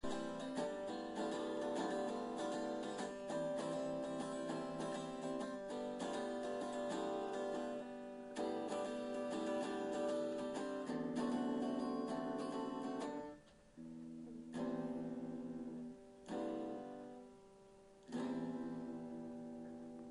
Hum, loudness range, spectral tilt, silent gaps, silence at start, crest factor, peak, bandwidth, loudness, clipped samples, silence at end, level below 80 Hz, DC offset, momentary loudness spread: none; 6 LU; -5.5 dB/octave; none; 0.05 s; 14 dB; -30 dBFS; 10.5 kHz; -44 LUFS; under 0.1%; 0 s; -74 dBFS; under 0.1%; 11 LU